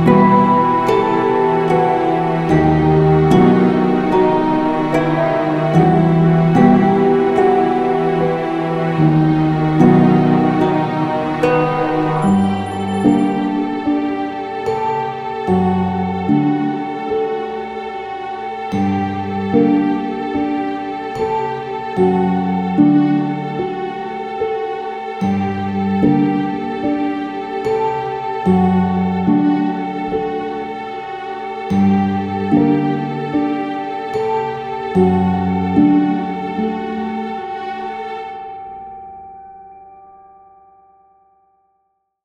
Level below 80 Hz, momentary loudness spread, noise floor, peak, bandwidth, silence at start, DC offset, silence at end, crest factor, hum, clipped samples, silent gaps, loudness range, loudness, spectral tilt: -46 dBFS; 12 LU; -67 dBFS; 0 dBFS; 9.6 kHz; 0 s; under 0.1%; 2.25 s; 16 dB; none; under 0.1%; none; 6 LU; -16 LUFS; -8.5 dB/octave